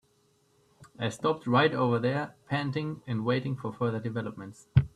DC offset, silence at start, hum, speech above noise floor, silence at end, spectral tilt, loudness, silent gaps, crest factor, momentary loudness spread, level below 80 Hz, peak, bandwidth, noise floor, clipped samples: under 0.1%; 0.8 s; none; 39 dB; 0.1 s; -7 dB/octave; -30 LUFS; none; 22 dB; 10 LU; -54 dBFS; -8 dBFS; 11 kHz; -68 dBFS; under 0.1%